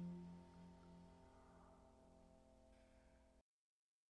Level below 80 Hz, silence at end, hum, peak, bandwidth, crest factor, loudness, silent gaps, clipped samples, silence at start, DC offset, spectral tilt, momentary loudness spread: -76 dBFS; 0.7 s; none; -46 dBFS; 10 kHz; 16 dB; -63 LUFS; none; under 0.1%; 0 s; under 0.1%; -8 dB/octave; 12 LU